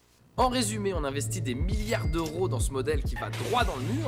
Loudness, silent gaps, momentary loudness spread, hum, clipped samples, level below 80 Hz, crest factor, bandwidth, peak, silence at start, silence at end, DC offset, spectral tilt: -29 LUFS; none; 4 LU; none; under 0.1%; -36 dBFS; 16 dB; 16.5 kHz; -14 dBFS; 0.35 s; 0 s; under 0.1%; -5 dB/octave